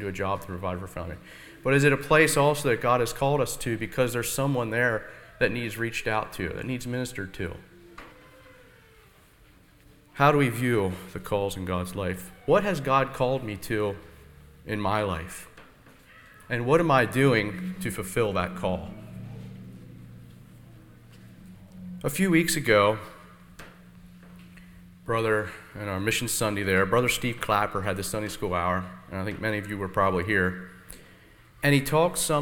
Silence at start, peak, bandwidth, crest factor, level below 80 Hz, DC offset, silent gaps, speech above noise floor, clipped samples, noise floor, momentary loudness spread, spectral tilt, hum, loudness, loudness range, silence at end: 0 s; -4 dBFS; 19 kHz; 22 dB; -50 dBFS; under 0.1%; none; 30 dB; under 0.1%; -56 dBFS; 21 LU; -5 dB/octave; none; -26 LUFS; 9 LU; 0 s